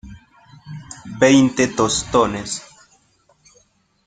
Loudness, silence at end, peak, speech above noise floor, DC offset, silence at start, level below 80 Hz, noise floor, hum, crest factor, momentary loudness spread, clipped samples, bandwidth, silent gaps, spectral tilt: -17 LUFS; 1.45 s; -2 dBFS; 43 dB; under 0.1%; 0.05 s; -48 dBFS; -59 dBFS; none; 20 dB; 22 LU; under 0.1%; 9.6 kHz; none; -4 dB/octave